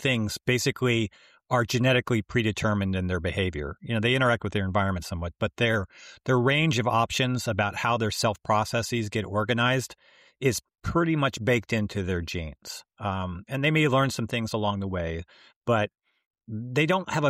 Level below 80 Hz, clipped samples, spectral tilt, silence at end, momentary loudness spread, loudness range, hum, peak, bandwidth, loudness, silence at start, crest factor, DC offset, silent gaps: -50 dBFS; under 0.1%; -5 dB/octave; 0 s; 11 LU; 3 LU; none; -12 dBFS; 15.5 kHz; -26 LUFS; 0 s; 16 dB; under 0.1%; 15.56-15.61 s, 16.26-16.31 s